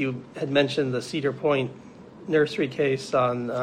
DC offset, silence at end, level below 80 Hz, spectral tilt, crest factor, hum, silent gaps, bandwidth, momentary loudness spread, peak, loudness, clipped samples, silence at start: under 0.1%; 0 s; -68 dBFS; -6 dB/octave; 18 dB; none; none; 10.5 kHz; 10 LU; -8 dBFS; -25 LUFS; under 0.1%; 0 s